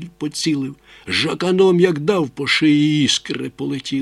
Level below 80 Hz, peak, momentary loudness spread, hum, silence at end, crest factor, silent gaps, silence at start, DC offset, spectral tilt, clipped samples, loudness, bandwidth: -56 dBFS; -2 dBFS; 12 LU; none; 0 s; 16 dB; none; 0 s; under 0.1%; -4.5 dB/octave; under 0.1%; -18 LUFS; 12.5 kHz